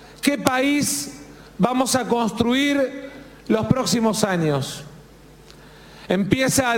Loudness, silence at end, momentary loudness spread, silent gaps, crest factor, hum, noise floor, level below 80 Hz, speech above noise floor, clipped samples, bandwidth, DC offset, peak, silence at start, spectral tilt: -21 LUFS; 0 s; 16 LU; none; 22 dB; none; -46 dBFS; -50 dBFS; 26 dB; under 0.1%; 17 kHz; under 0.1%; 0 dBFS; 0 s; -4 dB/octave